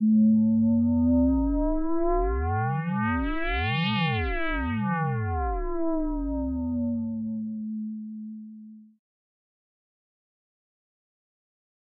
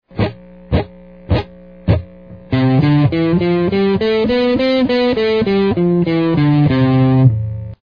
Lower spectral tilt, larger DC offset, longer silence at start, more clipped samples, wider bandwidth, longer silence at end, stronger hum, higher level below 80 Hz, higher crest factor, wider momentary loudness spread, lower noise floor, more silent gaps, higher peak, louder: second, -6 dB/octave vs -9.5 dB/octave; second, under 0.1% vs 0.3%; second, 0 s vs 0.15 s; neither; about the same, 5 kHz vs 5.2 kHz; first, 3.15 s vs 0.1 s; neither; about the same, -36 dBFS vs -34 dBFS; about the same, 12 dB vs 14 dB; first, 12 LU vs 9 LU; first, -46 dBFS vs -36 dBFS; neither; second, -16 dBFS vs 0 dBFS; second, -26 LUFS vs -15 LUFS